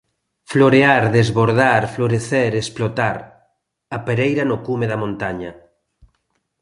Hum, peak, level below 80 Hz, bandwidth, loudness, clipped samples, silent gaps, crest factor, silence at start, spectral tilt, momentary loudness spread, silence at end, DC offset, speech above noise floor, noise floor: none; 0 dBFS; -50 dBFS; 11.5 kHz; -17 LUFS; under 0.1%; none; 18 dB; 0.5 s; -6.5 dB/octave; 13 LU; 1.1 s; under 0.1%; 53 dB; -70 dBFS